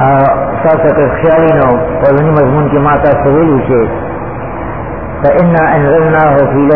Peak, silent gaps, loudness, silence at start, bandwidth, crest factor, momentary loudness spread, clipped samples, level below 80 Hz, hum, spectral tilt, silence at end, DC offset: 0 dBFS; none; -9 LUFS; 0 s; 3.9 kHz; 8 dB; 12 LU; 0.2%; -28 dBFS; none; -12 dB/octave; 0 s; 3%